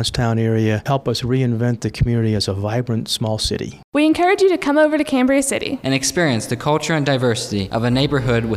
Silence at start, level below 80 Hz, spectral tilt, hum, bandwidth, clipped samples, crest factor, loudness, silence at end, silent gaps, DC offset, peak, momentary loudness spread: 0 s; -38 dBFS; -5 dB/octave; none; 15 kHz; under 0.1%; 14 dB; -18 LUFS; 0 s; 3.84-3.92 s; under 0.1%; -2 dBFS; 6 LU